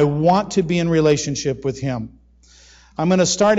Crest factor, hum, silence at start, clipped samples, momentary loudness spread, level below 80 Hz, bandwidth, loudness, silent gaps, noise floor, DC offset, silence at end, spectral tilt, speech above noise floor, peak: 14 dB; none; 0 s; under 0.1%; 11 LU; -46 dBFS; 8 kHz; -19 LUFS; none; -50 dBFS; under 0.1%; 0 s; -5 dB/octave; 32 dB; -6 dBFS